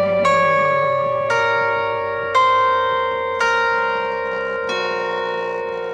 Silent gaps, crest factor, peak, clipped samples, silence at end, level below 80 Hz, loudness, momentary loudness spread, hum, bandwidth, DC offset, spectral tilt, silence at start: none; 14 dB; -4 dBFS; under 0.1%; 0 s; -54 dBFS; -18 LUFS; 7 LU; none; 10.5 kHz; under 0.1%; -4 dB/octave; 0 s